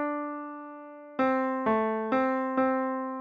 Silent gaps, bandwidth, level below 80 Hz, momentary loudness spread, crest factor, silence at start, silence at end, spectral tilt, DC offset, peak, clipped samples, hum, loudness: none; 5.2 kHz; -70 dBFS; 14 LU; 16 dB; 0 s; 0 s; -8 dB/octave; under 0.1%; -14 dBFS; under 0.1%; none; -28 LUFS